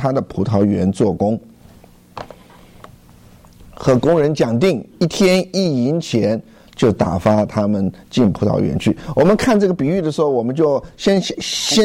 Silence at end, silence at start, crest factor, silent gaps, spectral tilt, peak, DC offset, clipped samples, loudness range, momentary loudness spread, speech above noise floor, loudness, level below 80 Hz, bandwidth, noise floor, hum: 0 s; 0 s; 12 dB; none; -6 dB/octave; -4 dBFS; under 0.1%; under 0.1%; 5 LU; 7 LU; 29 dB; -17 LUFS; -44 dBFS; 15.5 kHz; -45 dBFS; none